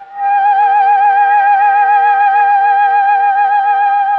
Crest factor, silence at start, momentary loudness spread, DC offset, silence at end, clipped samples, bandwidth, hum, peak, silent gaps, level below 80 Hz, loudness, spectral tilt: 8 dB; 0 s; 2 LU; under 0.1%; 0 s; under 0.1%; 4.3 kHz; none; -2 dBFS; none; -68 dBFS; -10 LUFS; -1.5 dB/octave